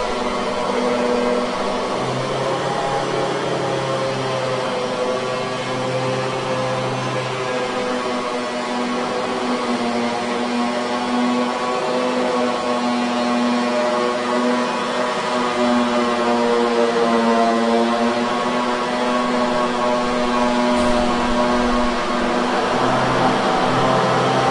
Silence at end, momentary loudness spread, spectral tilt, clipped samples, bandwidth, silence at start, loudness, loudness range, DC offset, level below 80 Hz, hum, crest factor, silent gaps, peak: 0 s; 5 LU; -4.5 dB/octave; under 0.1%; 11.5 kHz; 0 s; -19 LUFS; 4 LU; under 0.1%; -42 dBFS; none; 14 dB; none; -4 dBFS